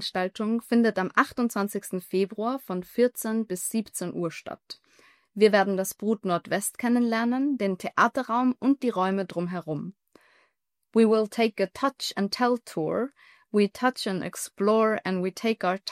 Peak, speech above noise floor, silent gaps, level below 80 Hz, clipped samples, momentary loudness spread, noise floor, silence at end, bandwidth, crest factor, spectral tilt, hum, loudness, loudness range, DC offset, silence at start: -6 dBFS; 48 dB; none; -72 dBFS; under 0.1%; 10 LU; -74 dBFS; 0 s; 16 kHz; 20 dB; -5 dB/octave; none; -26 LUFS; 3 LU; under 0.1%; 0 s